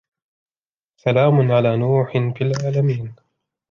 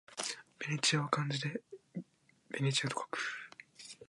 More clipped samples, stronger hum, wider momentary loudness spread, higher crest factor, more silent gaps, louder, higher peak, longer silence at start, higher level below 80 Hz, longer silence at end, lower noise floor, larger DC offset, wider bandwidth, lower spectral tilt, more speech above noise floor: neither; neither; second, 9 LU vs 17 LU; second, 16 dB vs 24 dB; neither; first, -18 LUFS vs -36 LUFS; first, -4 dBFS vs -14 dBFS; first, 1.05 s vs 0.1 s; first, -60 dBFS vs -82 dBFS; first, 0.55 s vs 0.05 s; first, under -90 dBFS vs -63 dBFS; neither; second, 7.2 kHz vs 11.5 kHz; first, -8 dB/octave vs -3.5 dB/octave; first, over 73 dB vs 28 dB